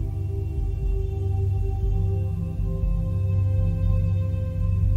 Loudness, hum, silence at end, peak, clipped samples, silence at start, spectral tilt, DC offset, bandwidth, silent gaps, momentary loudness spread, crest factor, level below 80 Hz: -26 LUFS; none; 0 s; -10 dBFS; under 0.1%; 0 s; -10 dB/octave; under 0.1%; 3.7 kHz; none; 5 LU; 12 dB; -28 dBFS